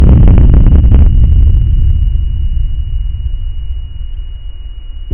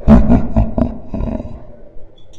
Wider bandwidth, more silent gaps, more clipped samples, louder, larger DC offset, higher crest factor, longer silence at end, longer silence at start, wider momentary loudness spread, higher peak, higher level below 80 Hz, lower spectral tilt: second, 3.2 kHz vs 6.2 kHz; neither; second, under 0.1% vs 0.5%; first, -11 LUFS vs -16 LUFS; neither; second, 8 dB vs 14 dB; about the same, 0 s vs 0 s; about the same, 0 s vs 0 s; about the same, 21 LU vs 20 LU; about the same, 0 dBFS vs 0 dBFS; first, -8 dBFS vs -20 dBFS; first, -12 dB/octave vs -10 dB/octave